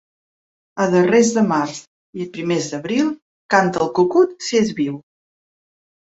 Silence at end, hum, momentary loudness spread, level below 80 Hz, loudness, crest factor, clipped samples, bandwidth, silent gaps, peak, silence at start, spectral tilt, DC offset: 1.1 s; none; 18 LU; -62 dBFS; -18 LUFS; 18 dB; under 0.1%; 8 kHz; 1.87-2.13 s, 3.22-3.49 s; -2 dBFS; 0.75 s; -5 dB/octave; under 0.1%